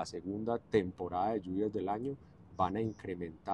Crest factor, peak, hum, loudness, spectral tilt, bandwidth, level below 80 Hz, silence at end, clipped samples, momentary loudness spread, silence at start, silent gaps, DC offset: 20 dB; -16 dBFS; none; -36 LUFS; -7 dB/octave; 10.5 kHz; -62 dBFS; 0 s; under 0.1%; 9 LU; 0 s; none; under 0.1%